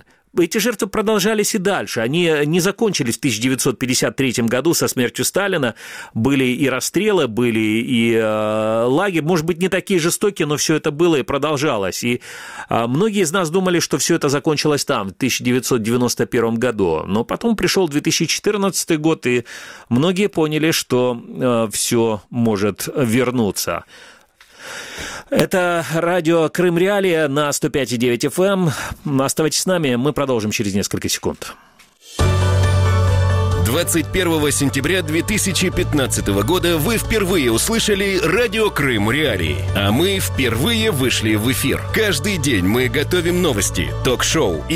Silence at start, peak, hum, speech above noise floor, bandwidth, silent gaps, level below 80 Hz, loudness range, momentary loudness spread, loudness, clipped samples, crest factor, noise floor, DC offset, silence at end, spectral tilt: 0.35 s; 0 dBFS; none; 28 dB; 16 kHz; none; -38 dBFS; 2 LU; 5 LU; -17 LUFS; under 0.1%; 18 dB; -46 dBFS; under 0.1%; 0 s; -4.5 dB/octave